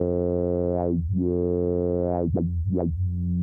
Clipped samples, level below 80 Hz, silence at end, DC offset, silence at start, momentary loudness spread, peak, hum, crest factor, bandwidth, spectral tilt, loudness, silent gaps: under 0.1%; -38 dBFS; 0 s; under 0.1%; 0 s; 2 LU; -12 dBFS; none; 12 dB; 2 kHz; -14.5 dB/octave; -25 LUFS; none